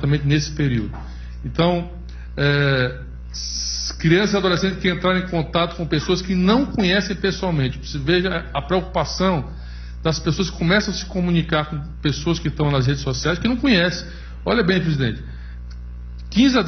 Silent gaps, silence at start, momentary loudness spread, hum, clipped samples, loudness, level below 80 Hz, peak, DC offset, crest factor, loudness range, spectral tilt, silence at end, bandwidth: none; 0 s; 16 LU; none; under 0.1%; -20 LUFS; -34 dBFS; -2 dBFS; under 0.1%; 18 dB; 3 LU; -5.5 dB/octave; 0 s; 6.6 kHz